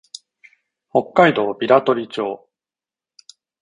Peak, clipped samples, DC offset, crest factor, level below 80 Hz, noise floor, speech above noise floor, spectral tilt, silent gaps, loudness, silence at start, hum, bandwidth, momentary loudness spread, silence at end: 0 dBFS; under 0.1%; under 0.1%; 20 dB; -62 dBFS; under -90 dBFS; over 73 dB; -6 dB/octave; none; -18 LUFS; 0.95 s; none; 11 kHz; 21 LU; 1.25 s